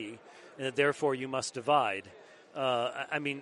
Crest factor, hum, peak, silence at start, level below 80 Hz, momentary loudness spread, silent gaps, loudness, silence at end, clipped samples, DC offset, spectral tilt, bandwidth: 20 dB; none; -12 dBFS; 0 s; -80 dBFS; 16 LU; none; -31 LUFS; 0 s; under 0.1%; under 0.1%; -4 dB/octave; 11.5 kHz